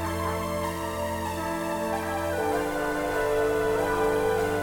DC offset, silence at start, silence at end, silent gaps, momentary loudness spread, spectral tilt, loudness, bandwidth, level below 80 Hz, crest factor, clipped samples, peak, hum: under 0.1%; 0 s; 0 s; none; 5 LU; -5 dB/octave; -27 LUFS; 19 kHz; -46 dBFS; 14 dB; under 0.1%; -14 dBFS; none